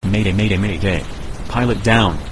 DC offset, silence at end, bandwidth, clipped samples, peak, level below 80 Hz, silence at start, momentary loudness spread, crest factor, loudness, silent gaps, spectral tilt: under 0.1%; 0 s; 11 kHz; under 0.1%; 0 dBFS; -28 dBFS; 0 s; 10 LU; 16 dB; -17 LUFS; none; -6 dB/octave